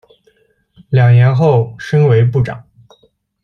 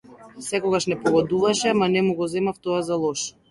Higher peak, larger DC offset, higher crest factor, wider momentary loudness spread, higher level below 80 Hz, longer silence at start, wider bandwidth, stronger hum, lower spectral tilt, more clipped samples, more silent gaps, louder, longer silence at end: first, -2 dBFS vs -6 dBFS; neither; about the same, 12 dB vs 16 dB; first, 9 LU vs 6 LU; first, -46 dBFS vs -60 dBFS; first, 0.9 s vs 0.1 s; second, 6.2 kHz vs 11.5 kHz; neither; first, -9 dB/octave vs -4.5 dB/octave; neither; neither; first, -12 LUFS vs -22 LUFS; first, 0.85 s vs 0.2 s